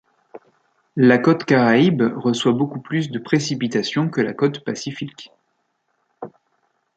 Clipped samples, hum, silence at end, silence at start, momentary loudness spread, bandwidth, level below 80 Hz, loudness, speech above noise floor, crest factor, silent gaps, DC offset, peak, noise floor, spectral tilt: under 0.1%; none; 0.65 s; 0.35 s; 17 LU; 8.8 kHz; -64 dBFS; -19 LUFS; 52 dB; 18 dB; none; under 0.1%; -2 dBFS; -70 dBFS; -6 dB/octave